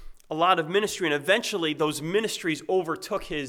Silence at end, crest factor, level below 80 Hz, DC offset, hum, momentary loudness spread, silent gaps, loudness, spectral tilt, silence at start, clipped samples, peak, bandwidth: 0 s; 18 dB; -54 dBFS; under 0.1%; none; 7 LU; none; -25 LUFS; -3.5 dB/octave; 0 s; under 0.1%; -8 dBFS; 18.5 kHz